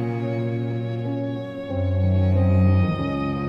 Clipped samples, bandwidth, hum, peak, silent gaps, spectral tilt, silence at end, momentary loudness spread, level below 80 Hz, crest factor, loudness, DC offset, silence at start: under 0.1%; 5.2 kHz; none; -8 dBFS; none; -10 dB/octave; 0 s; 9 LU; -44 dBFS; 12 dB; -23 LUFS; under 0.1%; 0 s